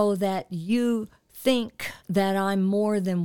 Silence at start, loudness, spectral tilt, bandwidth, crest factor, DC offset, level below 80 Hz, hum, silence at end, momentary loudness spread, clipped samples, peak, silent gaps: 0 s; -26 LUFS; -6 dB/octave; 18.5 kHz; 16 dB; under 0.1%; -62 dBFS; none; 0 s; 8 LU; under 0.1%; -8 dBFS; none